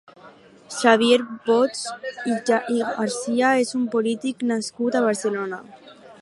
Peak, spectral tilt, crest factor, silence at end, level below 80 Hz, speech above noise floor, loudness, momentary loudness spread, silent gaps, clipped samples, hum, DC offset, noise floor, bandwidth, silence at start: -2 dBFS; -3.5 dB/octave; 20 dB; 0.05 s; -74 dBFS; 26 dB; -22 LUFS; 12 LU; none; under 0.1%; none; under 0.1%; -48 dBFS; 11.5 kHz; 0.25 s